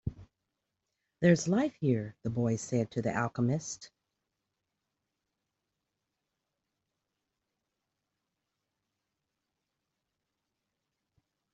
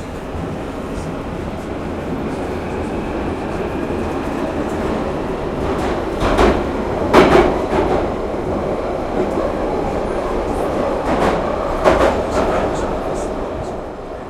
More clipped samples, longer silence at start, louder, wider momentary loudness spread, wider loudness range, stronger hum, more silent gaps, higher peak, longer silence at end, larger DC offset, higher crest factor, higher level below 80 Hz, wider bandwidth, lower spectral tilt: neither; about the same, 0.05 s vs 0 s; second, -31 LUFS vs -19 LUFS; about the same, 11 LU vs 11 LU; first, 10 LU vs 7 LU; neither; neither; second, -10 dBFS vs 0 dBFS; first, 7.7 s vs 0 s; neither; first, 26 dB vs 18 dB; second, -64 dBFS vs -30 dBFS; second, 8.2 kHz vs 15 kHz; about the same, -6.5 dB/octave vs -6.5 dB/octave